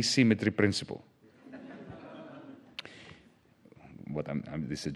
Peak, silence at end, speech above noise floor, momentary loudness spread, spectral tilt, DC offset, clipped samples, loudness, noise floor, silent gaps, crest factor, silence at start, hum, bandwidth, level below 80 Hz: -10 dBFS; 0 s; 32 dB; 24 LU; -5 dB/octave; under 0.1%; under 0.1%; -30 LUFS; -61 dBFS; none; 24 dB; 0 s; none; 12.5 kHz; -64 dBFS